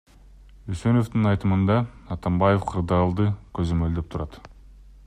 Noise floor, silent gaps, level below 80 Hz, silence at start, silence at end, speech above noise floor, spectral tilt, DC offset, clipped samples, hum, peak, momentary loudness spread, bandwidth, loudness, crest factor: -48 dBFS; none; -42 dBFS; 0.65 s; 0.6 s; 26 dB; -8.5 dB/octave; under 0.1%; under 0.1%; none; -8 dBFS; 12 LU; 10 kHz; -24 LUFS; 16 dB